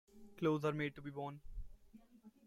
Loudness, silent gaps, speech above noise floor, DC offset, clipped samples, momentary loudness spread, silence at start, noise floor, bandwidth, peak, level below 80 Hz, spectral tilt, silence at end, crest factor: -41 LUFS; none; 24 dB; under 0.1%; under 0.1%; 24 LU; 0.15 s; -64 dBFS; 14.5 kHz; -24 dBFS; -58 dBFS; -7.5 dB/octave; 0.15 s; 20 dB